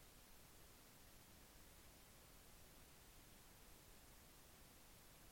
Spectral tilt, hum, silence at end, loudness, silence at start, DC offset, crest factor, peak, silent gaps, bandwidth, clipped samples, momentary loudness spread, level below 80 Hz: -3 dB/octave; none; 0 s; -65 LUFS; 0 s; under 0.1%; 14 dB; -52 dBFS; none; 16.5 kHz; under 0.1%; 0 LU; -72 dBFS